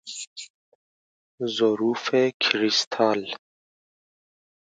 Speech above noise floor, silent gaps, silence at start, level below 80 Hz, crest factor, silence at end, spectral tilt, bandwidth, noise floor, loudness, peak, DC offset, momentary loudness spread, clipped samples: over 67 dB; 0.27-0.36 s, 0.50-1.38 s, 2.34-2.40 s, 2.87-2.91 s; 0.05 s; -76 dBFS; 24 dB; 1.3 s; -3 dB/octave; 9.4 kHz; under -90 dBFS; -23 LUFS; -2 dBFS; under 0.1%; 17 LU; under 0.1%